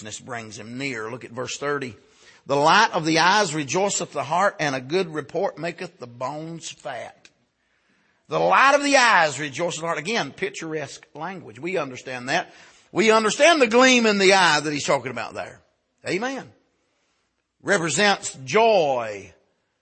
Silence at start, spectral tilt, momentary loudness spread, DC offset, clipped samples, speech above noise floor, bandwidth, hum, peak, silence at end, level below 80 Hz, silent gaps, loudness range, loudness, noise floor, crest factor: 0 s; -3 dB/octave; 19 LU; under 0.1%; under 0.1%; 50 dB; 8.8 kHz; none; -2 dBFS; 0.55 s; -70 dBFS; none; 10 LU; -20 LUFS; -72 dBFS; 20 dB